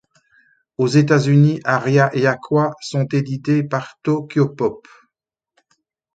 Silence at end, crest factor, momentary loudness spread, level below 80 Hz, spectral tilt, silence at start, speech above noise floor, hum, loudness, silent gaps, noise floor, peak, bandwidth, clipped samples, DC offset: 1.35 s; 18 dB; 9 LU; -60 dBFS; -7 dB/octave; 0.8 s; 65 dB; none; -18 LUFS; none; -82 dBFS; 0 dBFS; 8 kHz; under 0.1%; under 0.1%